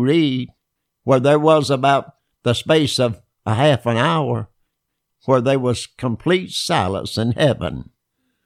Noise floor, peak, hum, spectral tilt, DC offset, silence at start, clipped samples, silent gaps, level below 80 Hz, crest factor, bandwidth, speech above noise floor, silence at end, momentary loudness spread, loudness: -76 dBFS; -2 dBFS; none; -5.5 dB/octave; under 0.1%; 0 s; under 0.1%; none; -50 dBFS; 16 dB; 14.5 kHz; 58 dB; 0.65 s; 11 LU; -18 LUFS